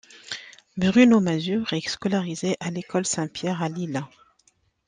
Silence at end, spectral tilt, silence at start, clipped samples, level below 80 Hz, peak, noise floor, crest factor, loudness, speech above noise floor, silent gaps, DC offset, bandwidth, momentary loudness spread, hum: 0.8 s; -5 dB/octave; 0.15 s; under 0.1%; -62 dBFS; -4 dBFS; -65 dBFS; 20 dB; -24 LUFS; 42 dB; none; under 0.1%; 9.8 kHz; 18 LU; none